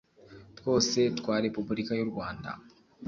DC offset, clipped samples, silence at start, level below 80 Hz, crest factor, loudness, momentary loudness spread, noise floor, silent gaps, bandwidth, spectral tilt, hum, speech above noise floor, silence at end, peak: under 0.1%; under 0.1%; 0.3 s; -60 dBFS; 18 dB; -30 LUFS; 14 LU; -53 dBFS; none; 7.6 kHz; -4.5 dB/octave; none; 23 dB; 0 s; -12 dBFS